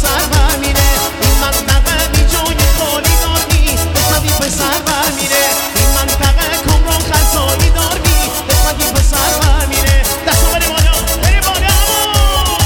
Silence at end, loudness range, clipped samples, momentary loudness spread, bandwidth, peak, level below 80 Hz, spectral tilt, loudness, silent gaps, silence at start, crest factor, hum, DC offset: 0 s; 1 LU; under 0.1%; 2 LU; over 20 kHz; 0 dBFS; -14 dBFS; -3 dB/octave; -12 LUFS; none; 0 s; 12 dB; none; under 0.1%